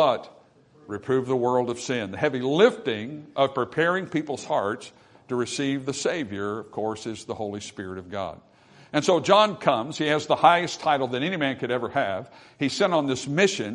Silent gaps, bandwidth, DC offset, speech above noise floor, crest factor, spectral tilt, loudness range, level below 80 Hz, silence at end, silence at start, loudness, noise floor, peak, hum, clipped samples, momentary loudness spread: none; 11 kHz; under 0.1%; 30 dB; 20 dB; -4.5 dB/octave; 8 LU; -68 dBFS; 0 s; 0 s; -25 LUFS; -55 dBFS; -4 dBFS; none; under 0.1%; 14 LU